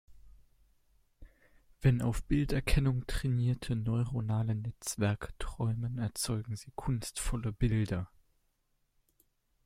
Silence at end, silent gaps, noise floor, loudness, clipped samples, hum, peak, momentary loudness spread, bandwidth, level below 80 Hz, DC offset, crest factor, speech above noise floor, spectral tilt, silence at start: 1.6 s; none; -76 dBFS; -34 LUFS; under 0.1%; none; -14 dBFS; 8 LU; 15.5 kHz; -42 dBFS; under 0.1%; 20 dB; 44 dB; -6 dB/octave; 0.1 s